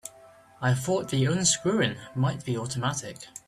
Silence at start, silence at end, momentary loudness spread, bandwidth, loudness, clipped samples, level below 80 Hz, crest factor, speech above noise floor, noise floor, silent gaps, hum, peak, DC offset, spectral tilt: 0.05 s; 0.1 s; 10 LU; 14 kHz; -27 LUFS; under 0.1%; -60 dBFS; 20 dB; 26 dB; -53 dBFS; none; none; -8 dBFS; under 0.1%; -4 dB/octave